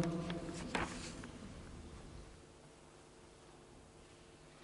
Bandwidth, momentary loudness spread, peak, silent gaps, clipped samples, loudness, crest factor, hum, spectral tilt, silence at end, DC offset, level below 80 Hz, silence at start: 11.5 kHz; 19 LU; -22 dBFS; none; under 0.1%; -45 LUFS; 26 dB; none; -5 dB/octave; 0 s; under 0.1%; -60 dBFS; 0 s